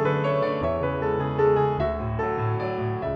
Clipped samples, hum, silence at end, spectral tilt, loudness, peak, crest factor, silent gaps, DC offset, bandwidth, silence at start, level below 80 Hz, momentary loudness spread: under 0.1%; none; 0 s; -9 dB/octave; -25 LUFS; -10 dBFS; 14 dB; none; under 0.1%; 6.2 kHz; 0 s; -44 dBFS; 6 LU